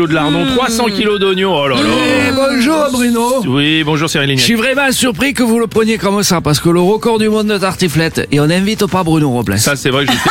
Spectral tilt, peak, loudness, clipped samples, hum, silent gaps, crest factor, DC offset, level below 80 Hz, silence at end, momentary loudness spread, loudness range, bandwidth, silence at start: -4.5 dB/octave; 0 dBFS; -12 LUFS; under 0.1%; none; none; 12 dB; under 0.1%; -40 dBFS; 0 s; 2 LU; 1 LU; 17 kHz; 0 s